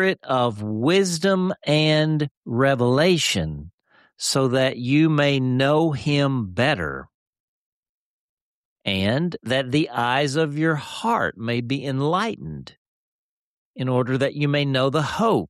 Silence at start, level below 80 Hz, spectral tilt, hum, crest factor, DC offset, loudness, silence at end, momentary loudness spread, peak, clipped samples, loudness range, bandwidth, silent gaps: 0 s; -54 dBFS; -5.5 dB/octave; none; 14 dB; under 0.1%; -21 LUFS; 0.05 s; 8 LU; -8 dBFS; under 0.1%; 6 LU; 13.5 kHz; 2.31-2.42 s, 3.73-3.78 s, 7.14-7.33 s, 7.40-7.83 s, 7.89-8.76 s, 12.77-13.74 s